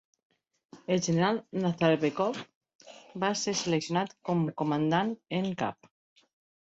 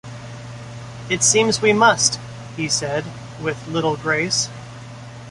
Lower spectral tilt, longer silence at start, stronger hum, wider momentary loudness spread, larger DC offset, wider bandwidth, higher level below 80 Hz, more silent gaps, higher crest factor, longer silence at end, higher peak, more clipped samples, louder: first, -5 dB/octave vs -2.5 dB/octave; first, 0.75 s vs 0.05 s; neither; second, 7 LU vs 21 LU; neither; second, 8.2 kHz vs 11.5 kHz; second, -70 dBFS vs -52 dBFS; first, 2.55-2.61 s, 2.75-2.79 s vs none; about the same, 20 dB vs 20 dB; first, 0.9 s vs 0 s; second, -12 dBFS vs -2 dBFS; neither; second, -29 LUFS vs -18 LUFS